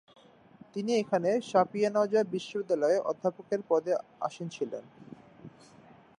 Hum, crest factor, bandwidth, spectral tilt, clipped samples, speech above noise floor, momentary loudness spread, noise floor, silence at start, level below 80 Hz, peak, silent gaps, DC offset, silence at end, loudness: none; 20 dB; 10.5 kHz; -5.5 dB/octave; under 0.1%; 27 dB; 11 LU; -56 dBFS; 0.75 s; -78 dBFS; -12 dBFS; none; under 0.1%; 0.7 s; -30 LUFS